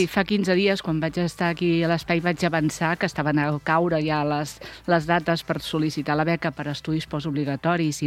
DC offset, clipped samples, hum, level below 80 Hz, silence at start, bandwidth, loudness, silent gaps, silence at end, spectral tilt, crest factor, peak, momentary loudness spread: under 0.1%; under 0.1%; none; -52 dBFS; 0 s; 15.5 kHz; -24 LUFS; none; 0 s; -6 dB/octave; 18 dB; -4 dBFS; 6 LU